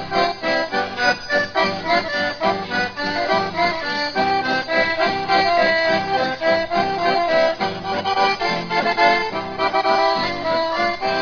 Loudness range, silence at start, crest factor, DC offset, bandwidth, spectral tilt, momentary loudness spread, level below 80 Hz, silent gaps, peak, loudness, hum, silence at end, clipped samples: 2 LU; 0 s; 16 dB; under 0.1%; 5.4 kHz; -4 dB/octave; 5 LU; -50 dBFS; none; -2 dBFS; -19 LUFS; none; 0 s; under 0.1%